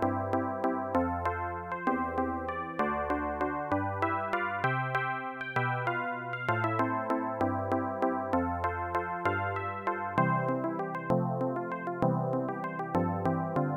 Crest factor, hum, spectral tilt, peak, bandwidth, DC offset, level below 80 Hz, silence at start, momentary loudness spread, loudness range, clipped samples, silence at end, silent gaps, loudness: 18 dB; none; -8.5 dB/octave; -14 dBFS; 13 kHz; under 0.1%; -56 dBFS; 0 s; 4 LU; 1 LU; under 0.1%; 0 s; none; -31 LUFS